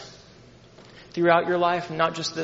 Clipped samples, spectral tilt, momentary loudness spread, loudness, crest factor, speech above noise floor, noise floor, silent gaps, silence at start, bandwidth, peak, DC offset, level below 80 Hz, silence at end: under 0.1%; -3.5 dB/octave; 13 LU; -23 LUFS; 22 dB; 28 dB; -50 dBFS; none; 0 s; 7.8 kHz; -4 dBFS; under 0.1%; -64 dBFS; 0 s